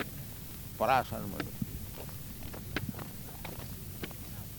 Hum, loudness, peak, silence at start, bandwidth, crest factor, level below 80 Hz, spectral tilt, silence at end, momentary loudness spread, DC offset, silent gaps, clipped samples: none; -37 LUFS; -14 dBFS; 0 s; 19.5 kHz; 24 dB; -50 dBFS; -5 dB/octave; 0 s; 13 LU; under 0.1%; none; under 0.1%